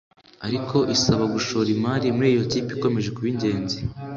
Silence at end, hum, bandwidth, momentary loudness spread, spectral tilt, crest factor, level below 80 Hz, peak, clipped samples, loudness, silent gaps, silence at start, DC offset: 0 s; none; 7.8 kHz; 9 LU; -5.5 dB/octave; 18 dB; -50 dBFS; -6 dBFS; under 0.1%; -23 LUFS; none; 0.4 s; under 0.1%